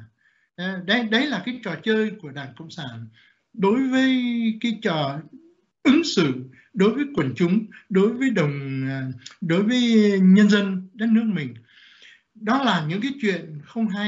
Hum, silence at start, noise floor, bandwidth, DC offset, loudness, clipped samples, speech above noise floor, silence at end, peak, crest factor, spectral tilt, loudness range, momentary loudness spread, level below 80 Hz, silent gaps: none; 0 s; -63 dBFS; 7.8 kHz; under 0.1%; -22 LUFS; under 0.1%; 42 dB; 0 s; -6 dBFS; 16 dB; -5 dB/octave; 5 LU; 16 LU; -66 dBFS; none